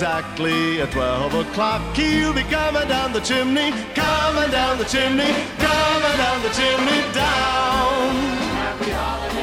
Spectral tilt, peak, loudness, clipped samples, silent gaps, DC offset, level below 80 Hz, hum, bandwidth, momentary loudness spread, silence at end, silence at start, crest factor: -4 dB/octave; -6 dBFS; -19 LUFS; under 0.1%; none; under 0.1%; -36 dBFS; none; 16.5 kHz; 5 LU; 0 s; 0 s; 14 dB